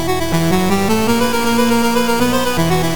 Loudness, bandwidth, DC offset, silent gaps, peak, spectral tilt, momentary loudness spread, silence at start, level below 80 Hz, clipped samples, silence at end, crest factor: -15 LUFS; 19.5 kHz; 7%; none; -4 dBFS; -5 dB/octave; 2 LU; 0 s; -34 dBFS; under 0.1%; 0 s; 12 dB